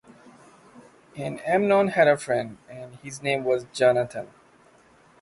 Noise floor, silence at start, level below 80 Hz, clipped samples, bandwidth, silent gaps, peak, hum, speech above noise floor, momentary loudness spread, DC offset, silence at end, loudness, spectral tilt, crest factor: -56 dBFS; 0.75 s; -66 dBFS; under 0.1%; 11.5 kHz; none; -6 dBFS; none; 33 dB; 21 LU; under 0.1%; 0.95 s; -23 LUFS; -5 dB/octave; 20 dB